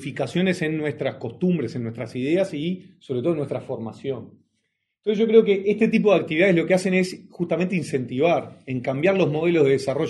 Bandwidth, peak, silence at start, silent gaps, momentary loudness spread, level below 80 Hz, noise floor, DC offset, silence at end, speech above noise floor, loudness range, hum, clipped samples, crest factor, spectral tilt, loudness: 11.5 kHz; -4 dBFS; 0 s; none; 13 LU; -66 dBFS; -75 dBFS; under 0.1%; 0 s; 53 dB; 7 LU; none; under 0.1%; 20 dB; -7 dB/octave; -22 LUFS